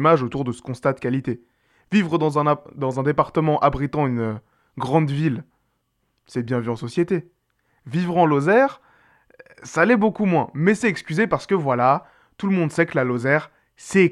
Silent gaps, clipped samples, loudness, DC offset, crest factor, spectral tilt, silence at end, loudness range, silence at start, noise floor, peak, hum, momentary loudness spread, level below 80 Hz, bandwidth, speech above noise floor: none; under 0.1%; -21 LUFS; under 0.1%; 18 dB; -7 dB/octave; 0 s; 5 LU; 0 s; -71 dBFS; -4 dBFS; none; 10 LU; -52 dBFS; 12 kHz; 51 dB